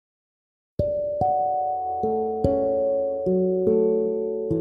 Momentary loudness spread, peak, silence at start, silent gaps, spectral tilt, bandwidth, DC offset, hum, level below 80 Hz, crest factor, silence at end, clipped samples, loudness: 6 LU; -6 dBFS; 0.8 s; none; -11.5 dB/octave; 5.2 kHz; under 0.1%; none; -46 dBFS; 16 dB; 0 s; under 0.1%; -24 LUFS